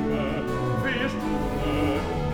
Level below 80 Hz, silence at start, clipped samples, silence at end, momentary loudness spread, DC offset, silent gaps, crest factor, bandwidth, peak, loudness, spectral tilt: -36 dBFS; 0 s; under 0.1%; 0 s; 2 LU; under 0.1%; none; 14 dB; over 20 kHz; -12 dBFS; -26 LUFS; -6.5 dB/octave